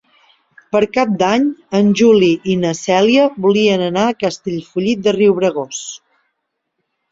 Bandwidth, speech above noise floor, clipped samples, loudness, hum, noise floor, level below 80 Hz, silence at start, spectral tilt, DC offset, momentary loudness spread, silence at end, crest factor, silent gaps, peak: 7.8 kHz; 59 dB; under 0.1%; -15 LUFS; none; -73 dBFS; -56 dBFS; 0.75 s; -5.5 dB/octave; under 0.1%; 12 LU; 1.15 s; 14 dB; none; -2 dBFS